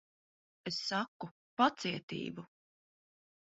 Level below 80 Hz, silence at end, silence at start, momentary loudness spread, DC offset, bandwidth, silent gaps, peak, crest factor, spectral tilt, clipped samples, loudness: -78 dBFS; 0.95 s; 0.65 s; 16 LU; under 0.1%; 7.6 kHz; 1.08-1.20 s, 1.31-1.57 s, 2.03-2.08 s; -14 dBFS; 26 dB; -2.5 dB/octave; under 0.1%; -36 LUFS